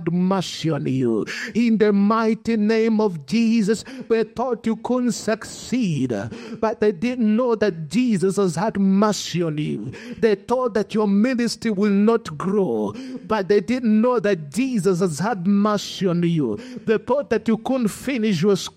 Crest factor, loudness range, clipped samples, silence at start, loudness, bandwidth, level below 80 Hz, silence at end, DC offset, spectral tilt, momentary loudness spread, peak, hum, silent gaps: 14 dB; 2 LU; under 0.1%; 0 s; -21 LUFS; 14 kHz; -58 dBFS; 0.05 s; under 0.1%; -6 dB/octave; 7 LU; -6 dBFS; none; none